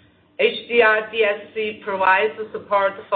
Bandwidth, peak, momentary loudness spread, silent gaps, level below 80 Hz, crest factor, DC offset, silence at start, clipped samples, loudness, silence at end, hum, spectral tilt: 4.6 kHz; -4 dBFS; 10 LU; none; -64 dBFS; 16 dB; under 0.1%; 0.4 s; under 0.1%; -19 LUFS; 0 s; none; -8 dB/octave